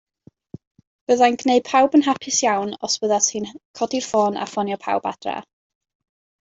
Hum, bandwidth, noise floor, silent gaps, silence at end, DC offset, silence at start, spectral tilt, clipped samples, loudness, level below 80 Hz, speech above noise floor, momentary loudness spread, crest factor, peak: none; 8 kHz; -43 dBFS; 3.65-3.74 s; 1.1 s; under 0.1%; 1.1 s; -2.5 dB/octave; under 0.1%; -20 LUFS; -66 dBFS; 23 dB; 13 LU; 18 dB; -4 dBFS